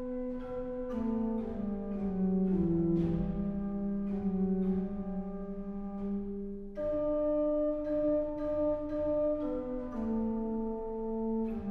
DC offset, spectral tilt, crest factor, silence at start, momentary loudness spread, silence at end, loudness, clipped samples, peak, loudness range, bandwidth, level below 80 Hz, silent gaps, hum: under 0.1%; -11.5 dB/octave; 12 dB; 0 s; 9 LU; 0 s; -34 LUFS; under 0.1%; -20 dBFS; 3 LU; 4.1 kHz; -48 dBFS; none; none